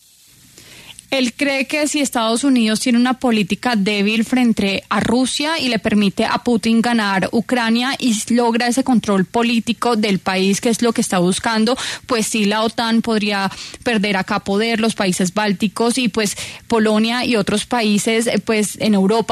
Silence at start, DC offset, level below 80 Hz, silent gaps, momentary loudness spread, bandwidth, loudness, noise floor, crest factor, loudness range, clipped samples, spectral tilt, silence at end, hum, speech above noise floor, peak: 0.7 s; under 0.1%; -52 dBFS; none; 3 LU; 13.5 kHz; -17 LUFS; -48 dBFS; 12 dB; 2 LU; under 0.1%; -4 dB/octave; 0 s; none; 32 dB; -4 dBFS